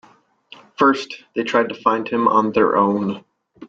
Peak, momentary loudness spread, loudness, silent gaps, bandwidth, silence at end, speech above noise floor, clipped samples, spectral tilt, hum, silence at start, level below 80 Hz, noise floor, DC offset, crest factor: -2 dBFS; 11 LU; -18 LUFS; none; 7.8 kHz; 0 s; 30 dB; under 0.1%; -6 dB/octave; none; 0.8 s; -62 dBFS; -48 dBFS; under 0.1%; 18 dB